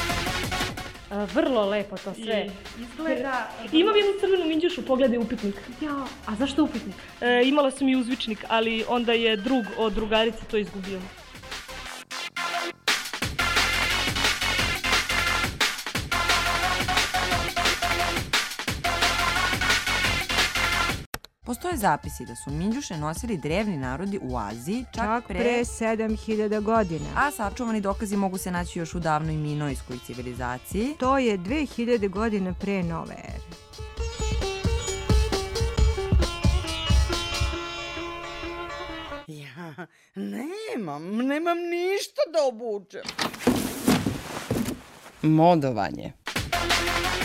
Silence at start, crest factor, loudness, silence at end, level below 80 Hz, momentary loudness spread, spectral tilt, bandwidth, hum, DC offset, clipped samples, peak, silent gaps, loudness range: 0 s; 18 dB; -25 LUFS; 0 s; -36 dBFS; 13 LU; -4 dB/octave; 16.5 kHz; none; under 0.1%; under 0.1%; -8 dBFS; 21.06-21.12 s; 6 LU